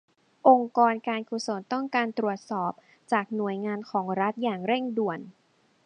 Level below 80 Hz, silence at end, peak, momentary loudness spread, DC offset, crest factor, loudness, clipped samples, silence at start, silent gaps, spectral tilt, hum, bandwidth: -82 dBFS; 0.55 s; -6 dBFS; 11 LU; under 0.1%; 22 dB; -27 LUFS; under 0.1%; 0.45 s; none; -5.5 dB/octave; none; 10 kHz